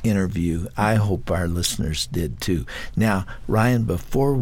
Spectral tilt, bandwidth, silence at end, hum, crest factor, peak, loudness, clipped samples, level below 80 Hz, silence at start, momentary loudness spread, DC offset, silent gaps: -5.5 dB/octave; 17 kHz; 0 s; none; 16 dB; -6 dBFS; -23 LUFS; under 0.1%; -34 dBFS; 0 s; 6 LU; under 0.1%; none